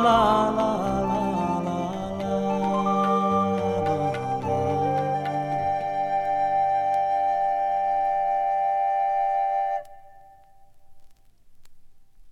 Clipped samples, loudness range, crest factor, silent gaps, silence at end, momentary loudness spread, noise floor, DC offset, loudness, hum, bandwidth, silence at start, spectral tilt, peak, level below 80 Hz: under 0.1%; 4 LU; 18 dB; none; 0 s; 5 LU; -50 dBFS; under 0.1%; -24 LUFS; none; 12 kHz; 0 s; -7 dB/octave; -8 dBFS; -52 dBFS